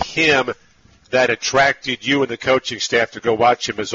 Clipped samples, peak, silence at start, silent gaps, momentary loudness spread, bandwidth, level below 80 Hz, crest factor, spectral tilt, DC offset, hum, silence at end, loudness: under 0.1%; -2 dBFS; 0 s; none; 6 LU; 8 kHz; -52 dBFS; 16 dB; -1.5 dB/octave; under 0.1%; none; 0 s; -17 LUFS